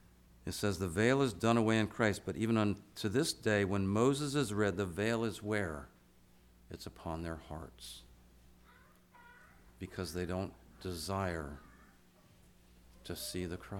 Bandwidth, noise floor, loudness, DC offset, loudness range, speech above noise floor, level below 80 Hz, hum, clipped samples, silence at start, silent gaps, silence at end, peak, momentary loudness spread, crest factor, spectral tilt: 18 kHz; -64 dBFS; -35 LUFS; under 0.1%; 16 LU; 29 dB; -58 dBFS; none; under 0.1%; 0.45 s; none; 0 s; -16 dBFS; 17 LU; 20 dB; -5.5 dB/octave